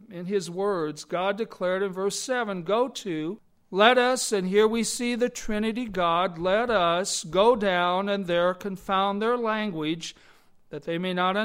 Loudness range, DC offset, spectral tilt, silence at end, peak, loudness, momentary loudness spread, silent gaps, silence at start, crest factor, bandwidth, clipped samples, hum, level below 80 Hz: 4 LU; under 0.1%; -4 dB/octave; 0 s; -4 dBFS; -25 LUFS; 10 LU; none; 0.1 s; 22 dB; 16 kHz; under 0.1%; none; -54 dBFS